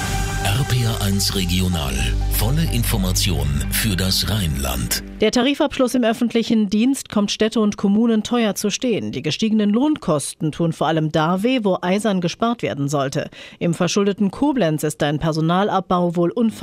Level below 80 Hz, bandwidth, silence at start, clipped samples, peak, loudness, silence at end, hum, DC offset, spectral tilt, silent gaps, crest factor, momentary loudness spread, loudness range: -30 dBFS; 16 kHz; 0 s; under 0.1%; -6 dBFS; -19 LUFS; 0 s; none; under 0.1%; -5 dB/octave; none; 12 dB; 4 LU; 2 LU